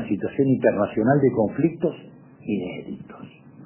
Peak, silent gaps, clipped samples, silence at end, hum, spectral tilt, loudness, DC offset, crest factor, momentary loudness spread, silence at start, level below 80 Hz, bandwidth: -4 dBFS; none; under 0.1%; 0 s; none; -12 dB/octave; -22 LUFS; under 0.1%; 18 dB; 19 LU; 0 s; -56 dBFS; 3.2 kHz